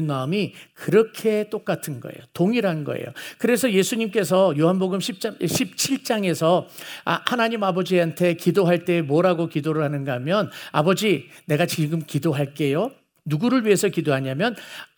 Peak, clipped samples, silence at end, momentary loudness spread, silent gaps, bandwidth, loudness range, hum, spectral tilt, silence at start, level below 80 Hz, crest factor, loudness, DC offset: 0 dBFS; under 0.1%; 0.15 s; 9 LU; none; over 20 kHz; 2 LU; none; -5.5 dB/octave; 0 s; -70 dBFS; 22 dB; -22 LUFS; under 0.1%